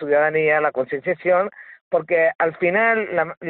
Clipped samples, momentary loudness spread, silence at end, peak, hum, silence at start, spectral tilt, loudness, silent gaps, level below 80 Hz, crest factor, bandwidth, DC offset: under 0.1%; 7 LU; 0 s; -6 dBFS; none; 0 s; -4 dB/octave; -20 LUFS; 1.81-1.91 s, 2.35-2.39 s, 3.37-3.41 s; -66 dBFS; 14 dB; 4.3 kHz; under 0.1%